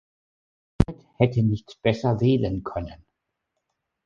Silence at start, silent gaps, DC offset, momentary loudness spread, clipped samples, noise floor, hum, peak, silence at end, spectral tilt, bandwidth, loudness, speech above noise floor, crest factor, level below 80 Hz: 0.8 s; none; under 0.1%; 11 LU; under 0.1%; -80 dBFS; none; -2 dBFS; 1.1 s; -8.5 dB/octave; 7.2 kHz; -24 LUFS; 57 dB; 24 dB; -42 dBFS